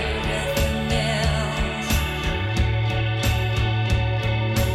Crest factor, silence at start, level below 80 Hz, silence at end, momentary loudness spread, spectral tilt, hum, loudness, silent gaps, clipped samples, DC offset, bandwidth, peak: 14 dB; 0 s; -28 dBFS; 0 s; 2 LU; -5 dB/octave; none; -23 LUFS; none; under 0.1%; under 0.1%; 15 kHz; -8 dBFS